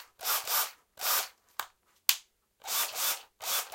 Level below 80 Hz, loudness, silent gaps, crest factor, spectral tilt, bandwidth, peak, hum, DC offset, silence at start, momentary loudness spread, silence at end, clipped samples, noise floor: -80 dBFS; -30 LUFS; none; 32 dB; 3.5 dB/octave; 17 kHz; -2 dBFS; none; under 0.1%; 0 s; 13 LU; 0 s; under 0.1%; -55 dBFS